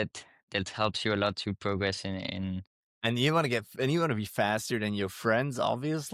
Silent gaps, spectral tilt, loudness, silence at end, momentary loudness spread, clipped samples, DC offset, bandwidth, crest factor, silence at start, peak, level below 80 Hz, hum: 0.43-0.48 s, 2.67-3.01 s; -5 dB/octave; -30 LUFS; 0 s; 8 LU; under 0.1%; under 0.1%; 16.5 kHz; 16 dB; 0 s; -14 dBFS; -64 dBFS; none